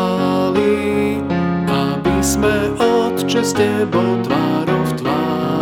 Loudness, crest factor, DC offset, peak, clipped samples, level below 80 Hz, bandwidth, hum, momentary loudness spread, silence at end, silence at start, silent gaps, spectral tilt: -17 LUFS; 14 dB; under 0.1%; -2 dBFS; under 0.1%; -38 dBFS; 17.5 kHz; none; 3 LU; 0 s; 0 s; none; -5.5 dB/octave